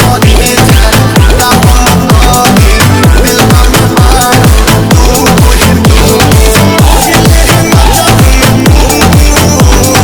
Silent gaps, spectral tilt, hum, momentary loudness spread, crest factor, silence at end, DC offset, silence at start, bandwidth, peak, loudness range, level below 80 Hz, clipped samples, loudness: none; -4.5 dB/octave; none; 1 LU; 4 dB; 0 s; under 0.1%; 0 s; over 20 kHz; 0 dBFS; 0 LU; -8 dBFS; 20%; -4 LUFS